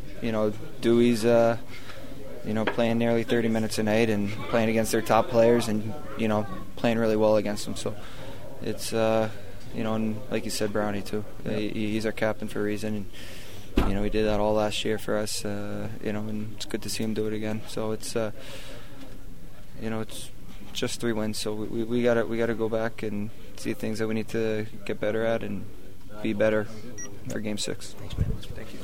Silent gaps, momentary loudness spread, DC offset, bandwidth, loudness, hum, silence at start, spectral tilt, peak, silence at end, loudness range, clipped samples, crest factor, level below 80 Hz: none; 18 LU; 3%; 16 kHz; -28 LUFS; none; 0 s; -5.5 dB/octave; -6 dBFS; 0 s; 8 LU; under 0.1%; 20 dB; -42 dBFS